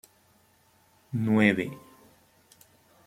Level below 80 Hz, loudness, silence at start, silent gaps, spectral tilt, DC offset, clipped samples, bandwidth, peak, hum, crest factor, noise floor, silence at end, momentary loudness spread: -68 dBFS; -26 LUFS; 1.1 s; none; -7 dB/octave; under 0.1%; under 0.1%; 15.5 kHz; -6 dBFS; none; 24 dB; -64 dBFS; 1.3 s; 16 LU